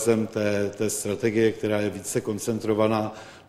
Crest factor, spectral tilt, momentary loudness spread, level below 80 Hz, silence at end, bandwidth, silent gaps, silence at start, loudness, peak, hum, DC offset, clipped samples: 18 dB; -5 dB/octave; 5 LU; -60 dBFS; 0.05 s; 15.5 kHz; none; 0 s; -25 LUFS; -8 dBFS; none; under 0.1%; under 0.1%